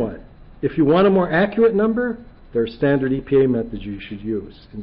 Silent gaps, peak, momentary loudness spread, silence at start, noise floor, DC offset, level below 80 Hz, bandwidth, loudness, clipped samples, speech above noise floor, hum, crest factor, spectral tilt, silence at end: none; -6 dBFS; 15 LU; 0 s; -40 dBFS; under 0.1%; -44 dBFS; 5.4 kHz; -19 LUFS; under 0.1%; 21 dB; none; 12 dB; -12 dB/octave; 0 s